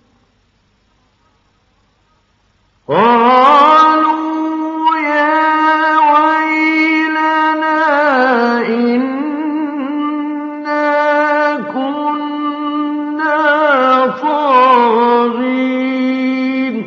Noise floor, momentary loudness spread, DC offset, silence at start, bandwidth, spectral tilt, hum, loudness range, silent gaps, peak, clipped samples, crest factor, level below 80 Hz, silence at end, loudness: -57 dBFS; 10 LU; under 0.1%; 2.9 s; 7.4 kHz; -2 dB/octave; none; 5 LU; none; 0 dBFS; under 0.1%; 12 dB; -66 dBFS; 0 s; -12 LUFS